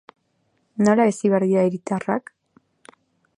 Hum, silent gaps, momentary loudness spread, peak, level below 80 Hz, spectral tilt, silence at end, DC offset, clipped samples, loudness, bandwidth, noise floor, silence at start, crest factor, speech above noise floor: none; none; 10 LU; -4 dBFS; -68 dBFS; -7 dB/octave; 1.2 s; under 0.1%; under 0.1%; -20 LUFS; 11 kHz; -68 dBFS; 0.8 s; 18 dB; 49 dB